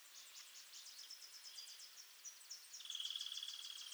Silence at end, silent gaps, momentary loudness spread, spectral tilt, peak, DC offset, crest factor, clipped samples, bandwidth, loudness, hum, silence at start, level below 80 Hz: 0 s; none; 11 LU; 5.5 dB/octave; -32 dBFS; under 0.1%; 20 dB; under 0.1%; over 20 kHz; -50 LUFS; none; 0 s; under -90 dBFS